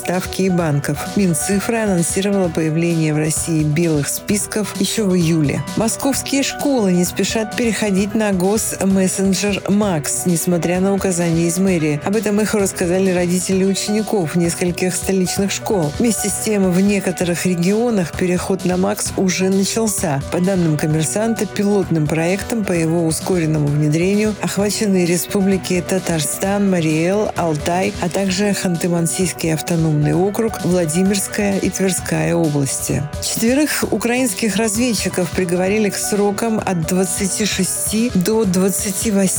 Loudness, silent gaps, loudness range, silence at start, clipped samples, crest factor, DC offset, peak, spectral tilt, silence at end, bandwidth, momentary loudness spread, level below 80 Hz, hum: -17 LUFS; none; 1 LU; 0 s; under 0.1%; 12 dB; under 0.1%; -6 dBFS; -5 dB/octave; 0 s; over 20 kHz; 3 LU; -44 dBFS; none